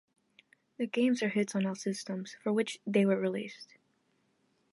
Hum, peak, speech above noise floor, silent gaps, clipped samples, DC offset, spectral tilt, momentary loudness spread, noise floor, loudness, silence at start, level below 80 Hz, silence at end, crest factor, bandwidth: none; -14 dBFS; 43 dB; none; under 0.1%; under 0.1%; -5.5 dB/octave; 11 LU; -74 dBFS; -32 LUFS; 0.8 s; -82 dBFS; 1.1 s; 20 dB; 11.5 kHz